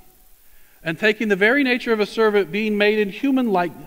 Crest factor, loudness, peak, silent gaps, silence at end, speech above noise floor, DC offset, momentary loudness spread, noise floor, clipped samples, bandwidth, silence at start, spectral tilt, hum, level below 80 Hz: 16 dB; -19 LUFS; -4 dBFS; none; 0 s; 31 dB; 0.2%; 5 LU; -50 dBFS; under 0.1%; 16 kHz; 0.85 s; -5.5 dB/octave; none; -56 dBFS